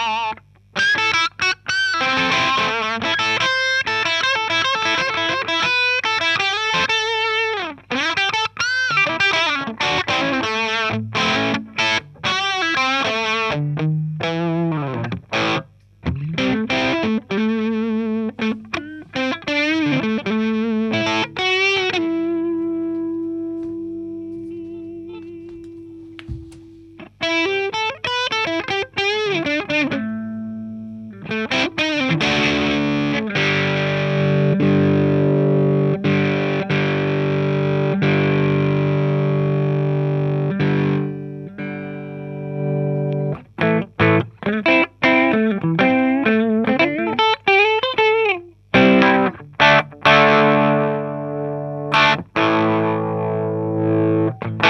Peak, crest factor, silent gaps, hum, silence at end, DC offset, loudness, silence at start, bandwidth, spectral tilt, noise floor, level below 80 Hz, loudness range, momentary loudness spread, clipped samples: 0 dBFS; 20 dB; none; 50 Hz at -50 dBFS; 0 s; under 0.1%; -18 LUFS; 0 s; 8.6 kHz; -5.5 dB/octave; -41 dBFS; -52 dBFS; 7 LU; 12 LU; under 0.1%